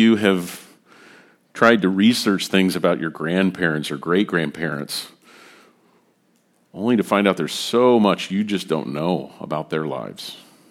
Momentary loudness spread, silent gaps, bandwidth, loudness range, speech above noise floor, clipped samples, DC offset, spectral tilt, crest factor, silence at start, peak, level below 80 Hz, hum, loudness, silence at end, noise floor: 14 LU; none; 16 kHz; 6 LU; 43 dB; under 0.1%; under 0.1%; -5.5 dB/octave; 20 dB; 0 s; 0 dBFS; -64 dBFS; none; -20 LUFS; 0.3 s; -62 dBFS